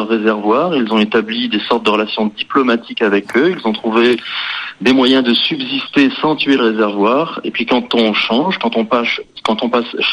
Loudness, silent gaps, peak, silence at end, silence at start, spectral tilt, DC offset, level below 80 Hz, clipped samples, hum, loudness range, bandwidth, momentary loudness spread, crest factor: -14 LUFS; none; 0 dBFS; 0 s; 0 s; -5.5 dB/octave; under 0.1%; -60 dBFS; under 0.1%; none; 1 LU; 11 kHz; 6 LU; 14 dB